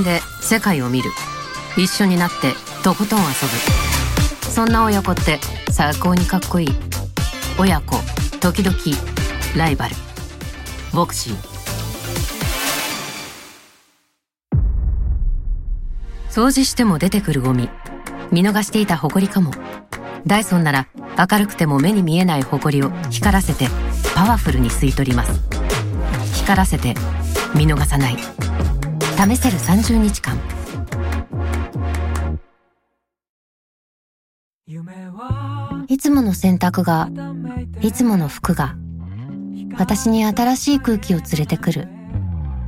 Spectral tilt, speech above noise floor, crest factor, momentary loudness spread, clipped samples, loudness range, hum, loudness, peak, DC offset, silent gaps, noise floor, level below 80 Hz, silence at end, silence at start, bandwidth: -5 dB/octave; 56 dB; 18 dB; 13 LU; under 0.1%; 7 LU; none; -18 LUFS; 0 dBFS; under 0.1%; 33.29-34.59 s; -73 dBFS; -26 dBFS; 0 s; 0 s; 17 kHz